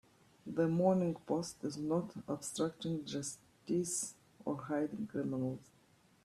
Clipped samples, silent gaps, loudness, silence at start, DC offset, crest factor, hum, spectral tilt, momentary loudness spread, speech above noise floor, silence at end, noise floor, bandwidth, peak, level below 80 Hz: under 0.1%; none; -38 LUFS; 0.45 s; under 0.1%; 20 dB; none; -5.5 dB/octave; 12 LU; 32 dB; 0.6 s; -68 dBFS; 14 kHz; -18 dBFS; -74 dBFS